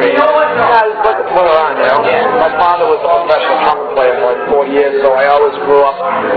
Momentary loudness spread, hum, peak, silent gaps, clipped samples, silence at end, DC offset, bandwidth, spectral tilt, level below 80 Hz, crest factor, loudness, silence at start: 3 LU; none; 0 dBFS; none; 0.2%; 0 s; under 0.1%; 5.4 kHz; -7 dB/octave; -46 dBFS; 10 dB; -10 LUFS; 0 s